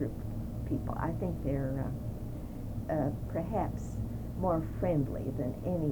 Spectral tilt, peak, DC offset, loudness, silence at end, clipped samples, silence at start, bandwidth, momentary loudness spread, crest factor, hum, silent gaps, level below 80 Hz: -9.5 dB/octave; -18 dBFS; under 0.1%; -35 LUFS; 0 s; under 0.1%; 0 s; over 20 kHz; 8 LU; 16 dB; none; none; -42 dBFS